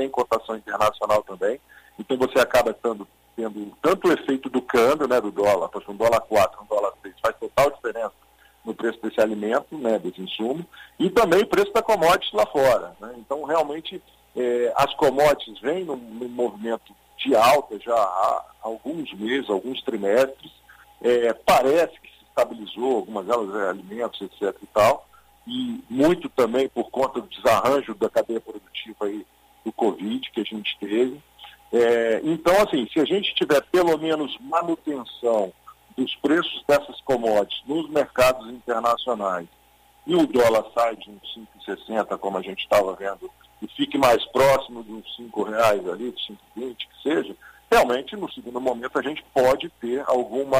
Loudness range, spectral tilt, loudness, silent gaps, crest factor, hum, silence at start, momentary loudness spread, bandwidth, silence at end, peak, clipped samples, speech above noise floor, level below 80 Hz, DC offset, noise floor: 4 LU; -4.5 dB/octave; -23 LUFS; none; 16 dB; none; 0 s; 14 LU; 15.5 kHz; 0 s; -6 dBFS; under 0.1%; 33 dB; -54 dBFS; under 0.1%; -56 dBFS